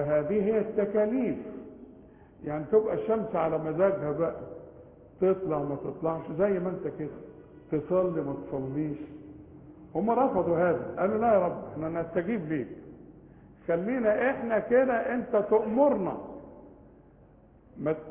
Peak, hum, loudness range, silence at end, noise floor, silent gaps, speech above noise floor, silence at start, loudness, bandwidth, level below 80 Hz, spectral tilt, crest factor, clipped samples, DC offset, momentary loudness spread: -12 dBFS; none; 5 LU; 0 s; -56 dBFS; none; 29 dB; 0 s; -28 LUFS; 3.6 kHz; -58 dBFS; -11.5 dB/octave; 18 dB; under 0.1%; under 0.1%; 18 LU